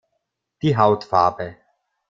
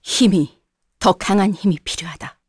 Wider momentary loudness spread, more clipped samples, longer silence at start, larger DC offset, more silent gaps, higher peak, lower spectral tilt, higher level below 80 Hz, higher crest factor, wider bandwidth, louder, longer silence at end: first, 15 LU vs 11 LU; neither; first, 0.65 s vs 0.05 s; neither; neither; about the same, -2 dBFS vs -2 dBFS; first, -7.5 dB/octave vs -5 dB/octave; second, -56 dBFS vs -46 dBFS; about the same, 20 dB vs 16 dB; second, 7.6 kHz vs 11 kHz; about the same, -19 LUFS vs -18 LUFS; first, 0.6 s vs 0.2 s